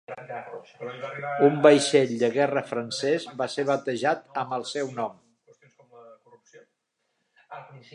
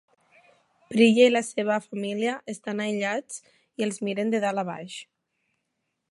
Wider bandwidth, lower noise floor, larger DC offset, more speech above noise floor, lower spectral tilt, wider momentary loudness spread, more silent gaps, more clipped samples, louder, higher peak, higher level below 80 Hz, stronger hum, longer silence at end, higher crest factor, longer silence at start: about the same, 11 kHz vs 11.5 kHz; about the same, -77 dBFS vs -79 dBFS; neither; about the same, 52 dB vs 55 dB; about the same, -4.5 dB/octave vs -4.5 dB/octave; about the same, 20 LU vs 19 LU; neither; neither; about the same, -25 LUFS vs -25 LUFS; first, -2 dBFS vs -6 dBFS; about the same, -80 dBFS vs -78 dBFS; neither; second, 0.15 s vs 1.1 s; about the same, 24 dB vs 20 dB; second, 0.1 s vs 0.9 s